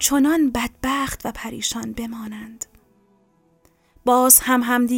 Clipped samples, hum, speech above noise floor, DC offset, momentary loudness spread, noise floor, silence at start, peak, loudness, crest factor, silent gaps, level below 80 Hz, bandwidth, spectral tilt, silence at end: under 0.1%; none; 41 dB; under 0.1%; 22 LU; -60 dBFS; 0 s; 0 dBFS; -18 LUFS; 22 dB; none; -46 dBFS; 17 kHz; -2 dB/octave; 0 s